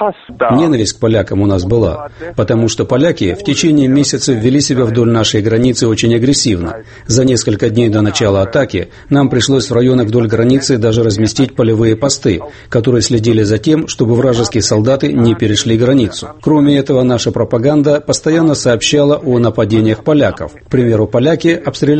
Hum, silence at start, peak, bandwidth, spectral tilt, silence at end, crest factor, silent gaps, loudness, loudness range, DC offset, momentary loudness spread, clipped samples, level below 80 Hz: none; 0 s; 0 dBFS; 8.8 kHz; -5.5 dB/octave; 0 s; 10 dB; none; -12 LUFS; 1 LU; under 0.1%; 5 LU; under 0.1%; -38 dBFS